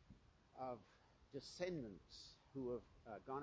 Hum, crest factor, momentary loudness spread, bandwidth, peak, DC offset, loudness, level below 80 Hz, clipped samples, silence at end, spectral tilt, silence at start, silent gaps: none; 20 dB; 13 LU; 8 kHz; -32 dBFS; under 0.1%; -52 LUFS; -74 dBFS; under 0.1%; 0 s; -5.5 dB/octave; 0 s; none